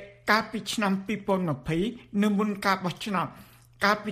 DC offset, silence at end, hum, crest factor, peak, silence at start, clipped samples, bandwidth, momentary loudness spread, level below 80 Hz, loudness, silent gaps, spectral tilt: under 0.1%; 0 s; none; 20 dB; -8 dBFS; 0 s; under 0.1%; 15.5 kHz; 5 LU; -56 dBFS; -27 LUFS; none; -5 dB/octave